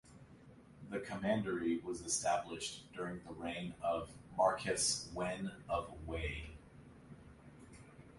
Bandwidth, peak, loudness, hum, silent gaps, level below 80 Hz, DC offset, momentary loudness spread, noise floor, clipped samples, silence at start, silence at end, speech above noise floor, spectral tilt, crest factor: 11.5 kHz; -20 dBFS; -39 LUFS; none; none; -58 dBFS; under 0.1%; 23 LU; -60 dBFS; under 0.1%; 0.05 s; 0 s; 21 dB; -3.5 dB/octave; 22 dB